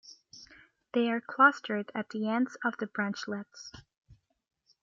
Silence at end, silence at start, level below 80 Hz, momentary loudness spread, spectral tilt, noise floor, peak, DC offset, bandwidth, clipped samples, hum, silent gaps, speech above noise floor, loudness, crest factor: 0.7 s; 0.05 s; -72 dBFS; 26 LU; -5 dB/octave; -58 dBFS; -10 dBFS; under 0.1%; 7.6 kHz; under 0.1%; none; 3.97-4.02 s; 28 dB; -30 LUFS; 24 dB